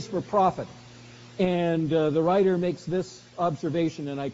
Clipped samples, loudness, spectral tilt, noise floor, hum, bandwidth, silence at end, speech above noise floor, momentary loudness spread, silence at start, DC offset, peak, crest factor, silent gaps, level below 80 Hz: under 0.1%; -26 LUFS; -6.5 dB/octave; -47 dBFS; none; 7.6 kHz; 0 s; 22 dB; 12 LU; 0 s; under 0.1%; -10 dBFS; 16 dB; none; -60 dBFS